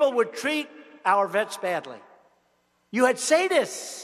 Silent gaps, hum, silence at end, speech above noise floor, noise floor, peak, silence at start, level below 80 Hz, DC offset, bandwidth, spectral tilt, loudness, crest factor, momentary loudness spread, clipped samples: none; none; 0 s; 44 dB; -68 dBFS; -6 dBFS; 0 s; -82 dBFS; under 0.1%; 14 kHz; -2.5 dB/octave; -24 LUFS; 18 dB; 11 LU; under 0.1%